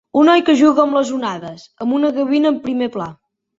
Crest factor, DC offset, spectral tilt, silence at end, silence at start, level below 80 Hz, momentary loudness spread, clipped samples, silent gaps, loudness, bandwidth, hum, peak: 14 dB; under 0.1%; -5 dB/octave; 0.45 s; 0.15 s; -60 dBFS; 16 LU; under 0.1%; none; -15 LUFS; 7.8 kHz; none; -2 dBFS